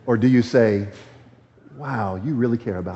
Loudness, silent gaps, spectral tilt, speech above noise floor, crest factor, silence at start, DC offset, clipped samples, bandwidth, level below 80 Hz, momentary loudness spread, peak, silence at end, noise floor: -20 LUFS; none; -7.5 dB/octave; 30 dB; 16 dB; 0.05 s; under 0.1%; under 0.1%; 8 kHz; -58 dBFS; 13 LU; -4 dBFS; 0 s; -50 dBFS